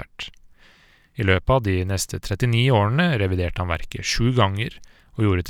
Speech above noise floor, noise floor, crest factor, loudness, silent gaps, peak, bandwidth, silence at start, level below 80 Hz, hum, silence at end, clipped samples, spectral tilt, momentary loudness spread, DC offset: 34 dB; -54 dBFS; 18 dB; -22 LUFS; none; -4 dBFS; 16 kHz; 0 s; -38 dBFS; none; 0 s; under 0.1%; -5.5 dB/octave; 15 LU; under 0.1%